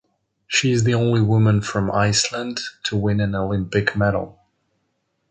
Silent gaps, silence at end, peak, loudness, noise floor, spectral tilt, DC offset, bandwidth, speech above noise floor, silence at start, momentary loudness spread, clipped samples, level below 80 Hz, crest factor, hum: none; 1 s; -2 dBFS; -20 LUFS; -71 dBFS; -5 dB/octave; under 0.1%; 9.4 kHz; 52 dB; 0.5 s; 9 LU; under 0.1%; -44 dBFS; 18 dB; none